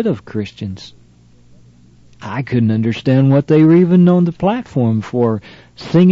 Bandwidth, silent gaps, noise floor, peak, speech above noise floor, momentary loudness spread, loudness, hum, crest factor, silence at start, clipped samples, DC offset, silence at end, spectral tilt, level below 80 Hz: 7.2 kHz; none; -46 dBFS; -2 dBFS; 33 dB; 17 LU; -14 LUFS; 60 Hz at -40 dBFS; 12 dB; 0 s; under 0.1%; under 0.1%; 0 s; -9 dB/octave; -52 dBFS